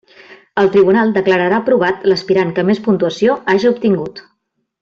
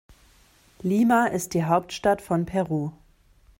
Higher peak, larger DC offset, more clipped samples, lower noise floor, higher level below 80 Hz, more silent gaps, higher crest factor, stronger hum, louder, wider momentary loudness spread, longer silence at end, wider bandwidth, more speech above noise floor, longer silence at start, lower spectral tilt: first, -2 dBFS vs -8 dBFS; neither; neither; first, -69 dBFS vs -57 dBFS; about the same, -54 dBFS vs -56 dBFS; neither; second, 12 dB vs 18 dB; neither; first, -14 LUFS vs -24 LUFS; second, 5 LU vs 9 LU; about the same, 0.6 s vs 0.65 s; second, 7.2 kHz vs 16.5 kHz; first, 56 dB vs 34 dB; second, 0.3 s vs 0.85 s; about the same, -7 dB/octave vs -6 dB/octave